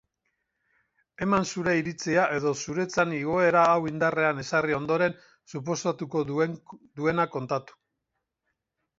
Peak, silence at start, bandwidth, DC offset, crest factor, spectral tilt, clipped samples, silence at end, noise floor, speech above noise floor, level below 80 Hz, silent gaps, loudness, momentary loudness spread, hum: -8 dBFS; 1.2 s; 7.8 kHz; under 0.1%; 20 dB; -5.5 dB/octave; under 0.1%; 1.35 s; -82 dBFS; 56 dB; -62 dBFS; none; -26 LUFS; 10 LU; none